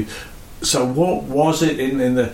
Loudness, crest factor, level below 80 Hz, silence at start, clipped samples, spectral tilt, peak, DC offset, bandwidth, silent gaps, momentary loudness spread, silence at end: -18 LUFS; 14 dB; -42 dBFS; 0 s; under 0.1%; -4.5 dB/octave; -4 dBFS; under 0.1%; 17 kHz; none; 13 LU; 0 s